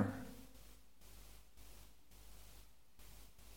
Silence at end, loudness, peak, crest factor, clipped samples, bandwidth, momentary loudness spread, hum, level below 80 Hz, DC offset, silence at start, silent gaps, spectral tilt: 0 s; -56 LUFS; -22 dBFS; 28 dB; under 0.1%; 17 kHz; 10 LU; none; -64 dBFS; 0.1%; 0 s; none; -6 dB/octave